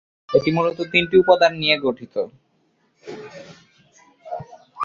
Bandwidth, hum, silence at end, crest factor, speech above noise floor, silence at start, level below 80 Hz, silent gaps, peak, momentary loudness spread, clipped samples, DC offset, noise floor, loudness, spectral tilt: 7.2 kHz; none; 0 s; 20 dB; 46 dB; 0.3 s; -58 dBFS; none; -2 dBFS; 22 LU; under 0.1%; under 0.1%; -65 dBFS; -18 LUFS; -6 dB/octave